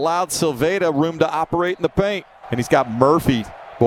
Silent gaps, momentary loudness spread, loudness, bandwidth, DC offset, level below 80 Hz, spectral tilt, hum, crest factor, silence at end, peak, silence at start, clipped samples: none; 9 LU; -19 LUFS; 17 kHz; under 0.1%; -46 dBFS; -5.5 dB/octave; none; 18 dB; 0 s; 0 dBFS; 0 s; under 0.1%